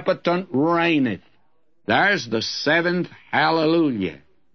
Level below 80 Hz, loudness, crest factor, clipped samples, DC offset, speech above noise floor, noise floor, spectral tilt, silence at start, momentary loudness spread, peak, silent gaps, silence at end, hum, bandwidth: -66 dBFS; -20 LUFS; 16 dB; under 0.1%; 0.2%; 47 dB; -68 dBFS; -5.5 dB/octave; 0 s; 9 LU; -4 dBFS; none; 0.4 s; none; 6.6 kHz